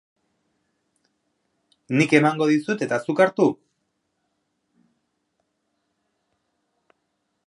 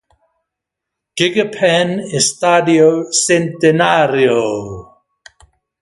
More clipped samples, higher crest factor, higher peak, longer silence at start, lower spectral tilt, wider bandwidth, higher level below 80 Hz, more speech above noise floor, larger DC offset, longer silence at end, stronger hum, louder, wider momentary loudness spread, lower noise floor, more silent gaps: neither; first, 26 dB vs 16 dB; about the same, 0 dBFS vs 0 dBFS; first, 1.9 s vs 1.15 s; first, -6 dB/octave vs -3.5 dB/octave; about the same, 11 kHz vs 11.5 kHz; second, -76 dBFS vs -54 dBFS; second, 55 dB vs 67 dB; neither; first, 3.95 s vs 1 s; neither; second, -20 LUFS vs -13 LUFS; second, 7 LU vs 10 LU; second, -75 dBFS vs -80 dBFS; neither